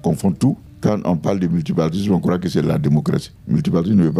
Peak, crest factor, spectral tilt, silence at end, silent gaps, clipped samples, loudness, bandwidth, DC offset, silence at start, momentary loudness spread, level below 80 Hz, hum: -4 dBFS; 14 dB; -8 dB/octave; 0 s; none; under 0.1%; -19 LUFS; 13 kHz; under 0.1%; 0.05 s; 4 LU; -46 dBFS; none